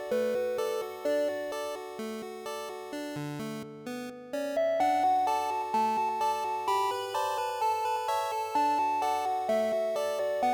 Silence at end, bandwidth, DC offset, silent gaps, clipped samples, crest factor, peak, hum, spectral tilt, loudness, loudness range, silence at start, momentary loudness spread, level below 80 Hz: 0 s; 19 kHz; under 0.1%; none; under 0.1%; 12 dB; -18 dBFS; none; -4 dB/octave; -31 LUFS; 7 LU; 0 s; 11 LU; -76 dBFS